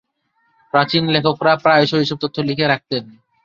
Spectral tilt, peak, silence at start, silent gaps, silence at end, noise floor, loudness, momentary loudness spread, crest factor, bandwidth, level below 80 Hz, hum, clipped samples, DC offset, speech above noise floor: -6.5 dB/octave; -2 dBFS; 0.75 s; none; 0.35 s; -65 dBFS; -17 LUFS; 8 LU; 16 dB; 7.4 kHz; -56 dBFS; none; under 0.1%; under 0.1%; 48 dB